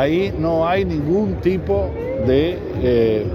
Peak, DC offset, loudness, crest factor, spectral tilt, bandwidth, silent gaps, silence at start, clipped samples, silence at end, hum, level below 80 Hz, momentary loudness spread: -4 dBFS; under 0.1%; -19 LUFS; 14 dB; -8.5 dB/octave; 13 kHz; none; 0 s; under 0.1%; 0 s; none; -34 dBFS; 5 LU